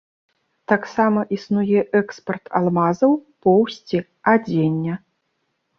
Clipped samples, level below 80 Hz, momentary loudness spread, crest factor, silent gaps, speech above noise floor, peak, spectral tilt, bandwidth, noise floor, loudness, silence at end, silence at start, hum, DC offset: under 0.1%; -62 dBFS; 9 LU; 18 dB; none; 53 dB; -2 dBFS; -8 dB/octave; 6.8 kHz; -72 dBFS; -20 LUFS; 0.8 s; 0.7 s; none; under 0.1%